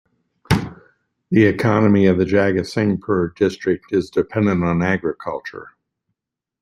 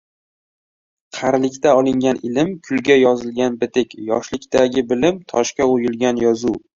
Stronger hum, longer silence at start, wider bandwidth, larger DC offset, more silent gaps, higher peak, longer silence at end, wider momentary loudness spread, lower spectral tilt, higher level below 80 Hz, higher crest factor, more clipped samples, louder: neither; second, 0.5 s vs 1.15 s; first, 13 kHz vs 7.6 kHz; neither; neither; about the same, -2 dBFS vs 0 dBFS; first, 0.9 s vs 0.2 s; first, 13 LU vs 7 LU; first, -7.5 dB/octave vs -5 dB/octave; first, -46 dBFS vs -52 dBFS; about the same, 18 dB vs 18 dB; neither; about the same, -18 LUFS vs -18 LUFS